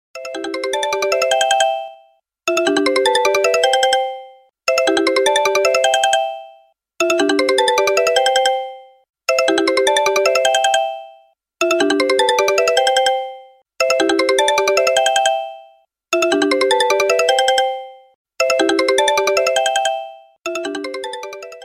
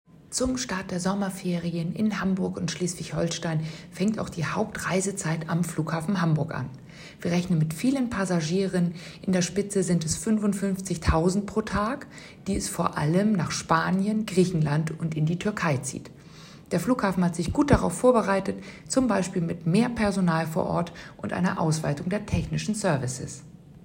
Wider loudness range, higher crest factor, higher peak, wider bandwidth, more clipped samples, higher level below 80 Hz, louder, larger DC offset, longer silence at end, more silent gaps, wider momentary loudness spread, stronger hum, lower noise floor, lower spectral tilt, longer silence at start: about the same, 2 LU vs 4 LU; about the same, 16 dB vs 20 dB; first, -2 dBFS vs -6 dBFS; about the same, 16 kHz vs 16 kHz; neither; second, -60 dBFS vs -44 dBFS; first, -16 LUFS vs -26 LUFS; neither; about the same, 0 s vs 0.05 s; first, 9.09-9.13 s, 18.15-18.25 s vs none; first, 12 LU vs 9 LU; neither; first, -53 dBFS vs -47 dBFS; second, -0.5 dB/octave vs -5.5 dB/octave; about the same, 0.15 s vs 0.2 s